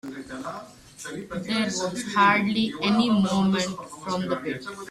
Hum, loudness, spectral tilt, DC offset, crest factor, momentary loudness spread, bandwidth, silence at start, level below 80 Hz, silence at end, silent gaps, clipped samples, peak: none; -24 LUFS; -4.5 dB/octave; under 0.1%; 18 dB; 17 LU; 13 kHz; 0.05 s; -58 dBFS; 0 s; none; under 0.1%; -6 dBFS